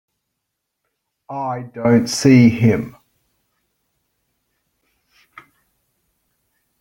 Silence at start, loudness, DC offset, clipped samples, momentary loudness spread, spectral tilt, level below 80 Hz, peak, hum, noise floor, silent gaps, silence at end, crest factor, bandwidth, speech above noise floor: 1.3 s; -15 LUFS; under 0.1%; under 0.1%; 17 LU; -6.5 dB/octave; -56 dBFS; -2 dBFS; none; -78 dBFS; none; 3.9 s; 18 dB; 17 kHz; 63 dB